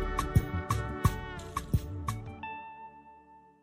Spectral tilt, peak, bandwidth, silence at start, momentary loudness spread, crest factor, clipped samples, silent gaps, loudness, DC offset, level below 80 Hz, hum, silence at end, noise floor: -6 dB/octave; -10 dBFS; 16 kHz; 0 s; 17 LU; 22 dB; under 0.1%; none; -34 LUFS; under 0.1%; -40 dBFS; none; 0.2 s; -57 dBFS